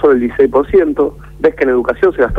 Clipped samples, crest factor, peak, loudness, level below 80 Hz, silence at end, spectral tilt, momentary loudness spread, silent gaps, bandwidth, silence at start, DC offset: under 0.1%; 10 dB; -2 dBFS; -13 LUFS; -32 dBFS; 0 s; -8.5 dB/octave; 5 LU; none; 5 kHz; 0 s; under 0.1%